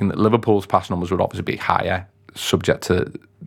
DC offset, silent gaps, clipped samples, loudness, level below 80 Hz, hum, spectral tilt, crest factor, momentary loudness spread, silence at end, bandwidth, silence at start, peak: under 0.1%; none; under 0.1%; -21 LUFS; -48 dBFS; none; -5.5 dB/octave; 20 dB; 9 LU; 0 s; 17.5 kHz; 0 s; 0 dBFS